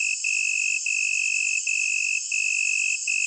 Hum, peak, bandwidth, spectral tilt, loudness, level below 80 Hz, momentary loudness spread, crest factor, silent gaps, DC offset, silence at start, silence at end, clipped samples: none; -12 dBFS; 9.4 kHz; 14.5 dB/octave; -22 LUFS; under -90 dBFS; 1 LU; 12 dB; none; under 0.1%; 0 s; 0 s; under 0.1%